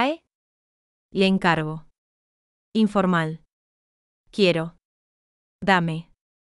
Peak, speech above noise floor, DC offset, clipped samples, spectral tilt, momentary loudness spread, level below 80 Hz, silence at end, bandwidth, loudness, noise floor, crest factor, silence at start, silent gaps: -6 dBFS; over 69 dB; under 0.1%; under 0.1%; -6.5 dB/octave; 15 LU; -58 dBFS; 0.55 s; 11.5 kHz; -22 LUFS; under -90 dBFS; 20 dB; 0 s; 0.35-1.09 s, 1.98-2.72 s, 3.53-4.24 s, 4.85-5.59 s